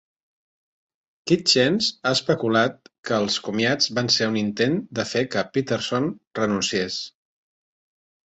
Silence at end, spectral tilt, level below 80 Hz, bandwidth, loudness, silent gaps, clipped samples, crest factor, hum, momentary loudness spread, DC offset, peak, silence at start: 1.2 s; -4 dB/octave; -62 dBFS; 8.2 kHz; -22 LUFS; 2.98-3.03 s, 6.27-6.31 s; under 0.1%; 20 dB; none; 8 LU; under 0.1%; -4 dBFS; 1.25 s